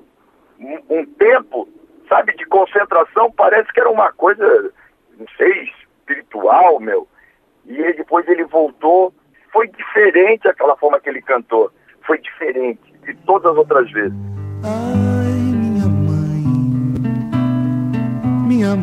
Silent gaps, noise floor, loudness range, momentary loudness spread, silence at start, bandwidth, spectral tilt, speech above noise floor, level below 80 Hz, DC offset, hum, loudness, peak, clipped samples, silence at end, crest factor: none; -54 dBFS; 3 LU; 11 LU; 0.6 s; 9.4 kHz; -8.5 dB/octave; 40 dB; -50 dBFS; under 0.1%; none; -15 LUFS; -2 dBFS; under 0.1%; 0 s; 14 dB